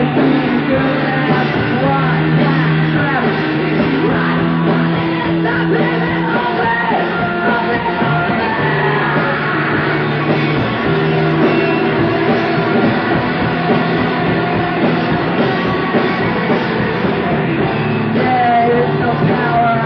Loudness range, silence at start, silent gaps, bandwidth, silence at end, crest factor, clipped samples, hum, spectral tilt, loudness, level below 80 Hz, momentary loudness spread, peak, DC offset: 1 LU; 0 s; none; 5.8 kHz; 0 s; 12 dB; under 0.1%; none; -9 dB/octave; -14 LUFS; -40 dBFS; 3 LU; -2 dBFS; under 0.1%